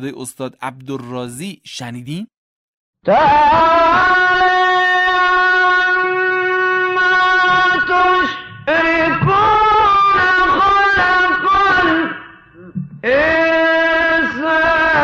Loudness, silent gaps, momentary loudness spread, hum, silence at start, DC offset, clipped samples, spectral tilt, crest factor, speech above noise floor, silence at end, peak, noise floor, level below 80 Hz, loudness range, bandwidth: -12 LUFS; 2.37-2.93 s; 16 LU; none; 0 s; under 0.1%; under 0.1%; -4.5 dB/octave; 10 dB; 24 dB; 0 s; -4 dBFS; -39 dBFS; -42 dBFS; 3 LU; 13.5 kHz